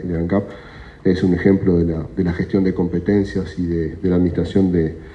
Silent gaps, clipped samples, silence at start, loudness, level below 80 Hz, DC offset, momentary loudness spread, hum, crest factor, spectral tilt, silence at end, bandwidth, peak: none; under 0.1%; 0 s; -19 LUFS; -38 dBFS; under 0.1%; 7 LU; none; 16 dB; -9 dB/octave; 0 s; 7.8 kHz; -2 dBFS